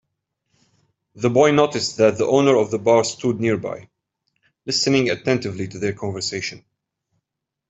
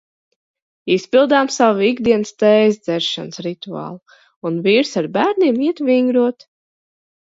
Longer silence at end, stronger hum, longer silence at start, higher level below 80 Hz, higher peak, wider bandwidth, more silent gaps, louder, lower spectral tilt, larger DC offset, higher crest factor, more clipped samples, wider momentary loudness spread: first, 1.15 s vs 0.9 s; neither; first, 1.15 s vs 0.85 s; about the same, -60 dBFS vs -62 dBFS; about the same, -2 dBFS vs 0 dBFS; about the same, 8.2 kHz vs 7.8 kHz; second, none vs 4.36-4.41 s; second, -19 LUFS vs -16 LUFS; about the same, -4.5 dB/octave vs -5 dB/octave; neither; about the same, 18 dB vs 16 dB; neither; about the same, 12 LU vs 14 LU